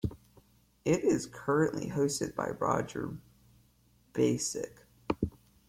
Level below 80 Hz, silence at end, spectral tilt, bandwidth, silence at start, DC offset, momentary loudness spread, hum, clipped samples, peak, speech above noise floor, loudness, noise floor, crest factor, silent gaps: -56 dBFS; 0.4 s; -5.5 dB/octave; 16.5 kHz; 0.05 s; under 0.1%; 11 LU; none; under 0.1%; -16 dBFS; 35 dB; -32 LUFS; -66 dBFS; 18 dB; none